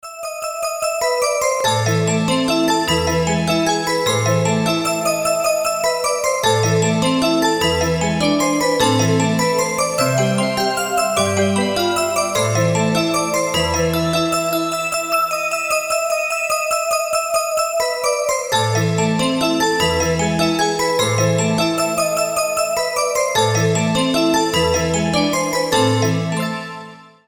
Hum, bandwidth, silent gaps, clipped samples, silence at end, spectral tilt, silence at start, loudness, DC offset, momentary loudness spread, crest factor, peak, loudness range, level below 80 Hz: none; over 20 kHz; none; under 0.1%; 0.25 s; -4 dB/octave; 0.05 s; -17 LUFS; 0.1%; 3 LU; 14 dB; -4 dBFS; 2 LU; -44 dBFS